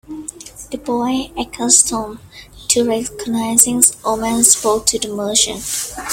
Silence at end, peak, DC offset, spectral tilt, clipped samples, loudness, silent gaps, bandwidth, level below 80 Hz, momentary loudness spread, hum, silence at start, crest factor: 0 s; 0 dBFS; under 0.1%; -1.5 dB/octave; under 0.1%; -14 LUFS; none; over 20 kHz; -44 dBFS; 19 LU; none; 0.1 s; 18 dB